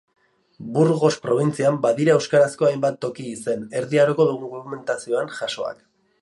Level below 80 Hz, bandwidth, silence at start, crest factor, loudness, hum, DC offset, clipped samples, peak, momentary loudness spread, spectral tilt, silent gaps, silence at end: -68 dBFS; 11.5 kHz; 0.6 s; 18 dB; -21 LUFS; none; under 0.1%; under 0.1%; -4 dBFS; 12 LU; -6 dB/octave; none; 0.5 s